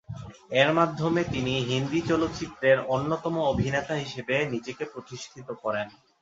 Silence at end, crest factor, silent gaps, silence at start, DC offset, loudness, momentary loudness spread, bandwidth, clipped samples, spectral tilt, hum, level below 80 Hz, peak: 0.3 s; 22 dB; none; 0.1 s; under 0.1%; -27 LUFS; 16 LU; 7.8 kHz; under 0.1%; -5.5 dB/octave; none; -52 dBFS; -6 dBFS